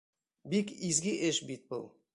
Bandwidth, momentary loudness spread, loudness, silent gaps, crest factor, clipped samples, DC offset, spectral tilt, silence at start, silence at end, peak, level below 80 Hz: 11.5 kHz; 11 LU; -33 LUFS; none; 20 dB; under 0.1%; under 0.1%; -3.5 dB/octave; 0.45 s; 0.25 s; -14 dBFS; -70 dBFS